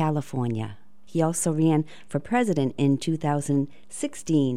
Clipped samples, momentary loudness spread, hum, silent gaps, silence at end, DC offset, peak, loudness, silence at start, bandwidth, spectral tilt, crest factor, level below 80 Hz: under 0.1%; 10 LU; none; none; 0 s; 0.9%; -10 dBFS; -26 LUFS; 0 s; 15 kHz; -6 dB/octave; 16 dB; -60 dBFS